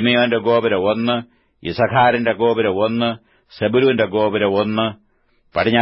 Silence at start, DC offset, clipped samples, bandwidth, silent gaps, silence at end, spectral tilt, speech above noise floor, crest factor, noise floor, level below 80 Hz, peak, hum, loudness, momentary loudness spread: 0 s; under 0.1%; under 0.1%; 5.8 kHz; none; 0 s; -11 dB/octave; 43 dB; 14 dB; -59 dBFS; -54 dBFS; -2 dBFS; none; -18 LUFS; 9 LU